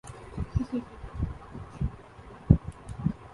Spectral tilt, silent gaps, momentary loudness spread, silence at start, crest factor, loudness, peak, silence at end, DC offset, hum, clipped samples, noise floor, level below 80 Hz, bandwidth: -9 dB/octave; none; 19 LU; 0.05 s; 28 dB; -31 LUFS; -2 dBFS; 0 s; under 0.1%; none; under 0.1%; -48 dBFS; -38 dBFS; 11.5 kHz